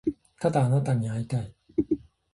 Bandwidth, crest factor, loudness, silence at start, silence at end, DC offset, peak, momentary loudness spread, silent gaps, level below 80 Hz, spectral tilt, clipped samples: 11.5 kHz; 18 dB; -28 LUFS; 0.05 s; 0.35 s; under 0.1%; -10 dBFS; 9 LU; none; -54 dBFS; -8.5 dB/octave; under 0.1%